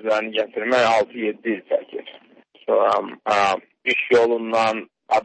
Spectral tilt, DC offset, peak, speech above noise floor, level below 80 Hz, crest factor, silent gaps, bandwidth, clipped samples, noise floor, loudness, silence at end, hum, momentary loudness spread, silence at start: -4 dB/octave; under 0.1%; -6 dBFS; 32 dB; -66 dBFS; 16 dB; none; 8.8 kHz; under 0.1%; -53 dBFS; -21 LUFS; 0 s; none; 9 LU; 0 s